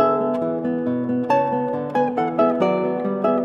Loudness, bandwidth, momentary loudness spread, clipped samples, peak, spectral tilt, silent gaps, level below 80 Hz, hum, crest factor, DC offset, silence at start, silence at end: -21 LUFS; 6.8 kHz; 4 LU; under 0.1%; -4 dBFS; -8.5 dB/octave; none; -66 dBFS; none; 16 dB; under 0.1%; 0 s; 0 s